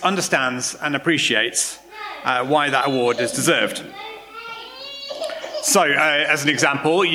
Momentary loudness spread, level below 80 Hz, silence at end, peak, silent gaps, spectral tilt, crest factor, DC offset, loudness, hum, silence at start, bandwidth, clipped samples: 17 LU; -64 dBFS; 0 s; -2 dBFS; none; -2.5 dB/octave; 18 dB; under 0.1%; -19 LUFS; none; 0 s; 19 kHz; under 0.1%